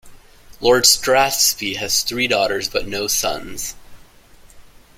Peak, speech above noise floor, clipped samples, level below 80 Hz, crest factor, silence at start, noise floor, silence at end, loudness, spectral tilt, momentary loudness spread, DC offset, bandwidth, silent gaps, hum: 0 dBFS; 28 dB; under 0.1%; -44 dBFS; 20 dB; 0.05 s; -46 dBFS; 0.35 s; -17 LUFS; -1 dB/octave; 13 LU; under 0.1%; 16.5 kHz; none; none